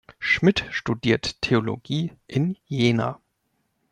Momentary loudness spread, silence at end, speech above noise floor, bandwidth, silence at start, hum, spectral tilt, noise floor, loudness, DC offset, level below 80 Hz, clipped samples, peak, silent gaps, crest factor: 8 LU; 0.75 s; 49 dB; 10.5 kHz; 0.2 s; none; -6 dB/octave; -73 dBFS; -23 LUFS; under 0.1%; -52 dBFS; under 0.1%; -6 dBFS; none; 18 dB